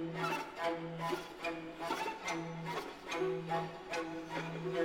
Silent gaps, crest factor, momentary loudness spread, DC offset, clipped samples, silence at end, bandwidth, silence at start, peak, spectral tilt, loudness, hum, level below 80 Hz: none; 16 dB; 4 LU; under 0.1%; under 0.1%; 0 s; 20 kHz; 0 s; -22 dBFS; -5 dB/octave; -40 LUFS; none; -68 dBFS